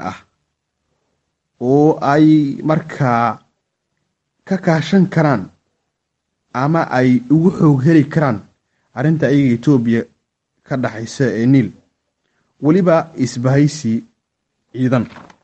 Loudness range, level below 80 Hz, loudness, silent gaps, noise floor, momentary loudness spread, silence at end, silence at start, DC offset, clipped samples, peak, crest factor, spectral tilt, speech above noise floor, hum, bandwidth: 4 LU; -54 dBFS; -15 LUFS; none; -74 dBFS; 12 LU; 0.25 s; 0 s; under 0.1%; under 0.1%; 0 dBFS; 16 dB; -8 dB/octave; 60 dB; none; 8.6 kHz